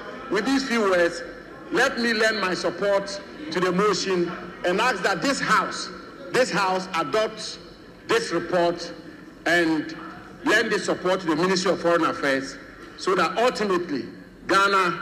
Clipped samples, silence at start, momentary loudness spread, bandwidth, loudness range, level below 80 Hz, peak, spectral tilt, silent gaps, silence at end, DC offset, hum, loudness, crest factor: under 0.1%; 0 s; 15 LU; 15 kHz; 2 LU; -58 dBFS; -8 dBFS; -4 dB/octave; none; 0 s; under 0.1%; none; -23 LUFS; 16 dB